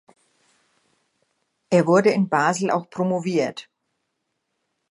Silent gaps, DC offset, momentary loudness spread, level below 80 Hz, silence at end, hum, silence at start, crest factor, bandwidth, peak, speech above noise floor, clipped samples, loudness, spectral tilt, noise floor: none; under 0.1%; 7 LU; -74 dBFS; 1.3 s; none; 1.7 s; 20 dB; 11.5 kHz; -4 dBFS; 56 dB; under 0.1%; -21 LUFS; -6 dB/octave; -76 dBFS